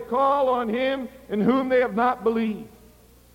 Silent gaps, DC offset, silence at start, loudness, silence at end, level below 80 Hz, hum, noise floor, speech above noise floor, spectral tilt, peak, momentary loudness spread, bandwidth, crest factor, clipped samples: none; under 0.1%; 0 s; -23 LUFS; 0.65 s; -56 dBFS; none; -52 dBFS; 30 dB; -7 dB/octave; -8 dBFS; 9 LU; 16.5 kHz; 16 dB; under 0.1%